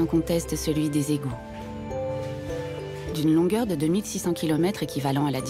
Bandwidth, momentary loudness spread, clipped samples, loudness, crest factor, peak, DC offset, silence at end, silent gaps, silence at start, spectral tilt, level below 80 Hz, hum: 16 kHz; 11 LU; under 0.1%; -26 LUFS; 14 dB; -12 dBFS; under 0.1%; 0 s; none; 0 s; -6 dB/octave; -46 dBFS; none